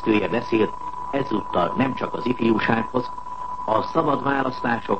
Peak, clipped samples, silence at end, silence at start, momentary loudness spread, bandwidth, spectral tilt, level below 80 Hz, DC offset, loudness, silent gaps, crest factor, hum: -4 dBFS; under 0.1%; 0 s; 0 s; 8 LU; 8.4 kHz; -7.5 dB/octave; -50 dBFS; 1%; -23 LUFS; none; 18 dB; none